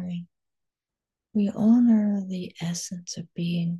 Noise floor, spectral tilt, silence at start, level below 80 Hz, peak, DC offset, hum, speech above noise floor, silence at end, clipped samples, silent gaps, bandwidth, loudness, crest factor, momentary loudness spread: -89 dBFS; -6 dB/octave; 0 s; -72 dBFS; -12 dBFS; under 0.1%; none; 66 dB; 0 s; under 0.1%; none; 12 kHz; -25 LUFS; 14 dB; 16 LU